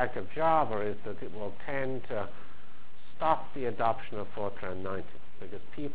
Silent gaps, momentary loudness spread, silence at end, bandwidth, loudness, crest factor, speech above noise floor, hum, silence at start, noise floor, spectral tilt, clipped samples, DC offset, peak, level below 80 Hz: none; 17 LU; 0 s; 4 kHz; -33 LUFS; 22 dB; 24 dB; none; 0 s; -57 dBFS; -9.5 dB/octave; under 0.1%; 4%; -12 dBFS; -58 dBFS